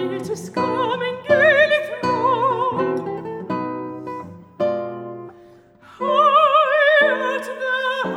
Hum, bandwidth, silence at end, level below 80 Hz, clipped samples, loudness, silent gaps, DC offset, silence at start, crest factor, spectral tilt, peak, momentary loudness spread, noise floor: none; 12.5 kHz; 0 s; -68 dBFS; under 0.1%; -18 LUFS; none; under 0.1%; 0 s; 16 dB; -5 dB/octave; -2 dBFS; 17 LU; -47 dBFS